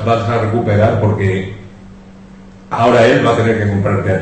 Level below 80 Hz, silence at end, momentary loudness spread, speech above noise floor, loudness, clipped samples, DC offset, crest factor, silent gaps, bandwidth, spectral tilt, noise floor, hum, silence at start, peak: -40 dBFS; 0 s; 12 LU; 24 dB; -13 LUFS; under 0.1%; 0.1%; 12 dB; none; 8.6 kHz; -7.5 dB/octave; -37 dBFS; none; 0 s; -2 dBFS